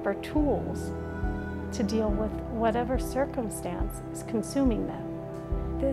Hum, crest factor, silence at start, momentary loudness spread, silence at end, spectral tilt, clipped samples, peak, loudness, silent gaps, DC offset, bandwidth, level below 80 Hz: none; 16 dB; 0 s; 8 LU; 0 s; -6.5 dB/octave; under 0.1%; -12 dBFS; -30 LUFS; none; under 0.1%; 14.5 kHz; -38 dBFS